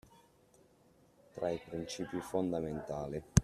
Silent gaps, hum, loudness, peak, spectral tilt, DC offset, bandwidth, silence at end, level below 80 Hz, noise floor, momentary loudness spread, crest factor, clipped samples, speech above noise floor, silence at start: none; none; -38 LUFS; -12 dBFS; -6 dB/octave; under 0.1%; 14 kHz; 0 s; -50 dBFS; -67 dBFS; 6 LU; 26 dB; under 0.1%; 31 dB; 1.35 s